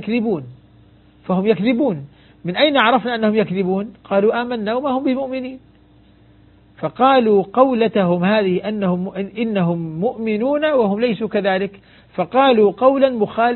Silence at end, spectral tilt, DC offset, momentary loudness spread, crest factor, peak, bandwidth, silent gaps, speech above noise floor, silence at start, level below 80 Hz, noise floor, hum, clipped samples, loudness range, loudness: 0 s; -10 dB/octave; under 0.1%; 12 LU; 18 dB; 0 dBFS; 4.4 kHz; none; 33 dB; 0 s; -56 dBFS; -50 dBFS; none; under 0.1%; 3 LU; -18 LUFS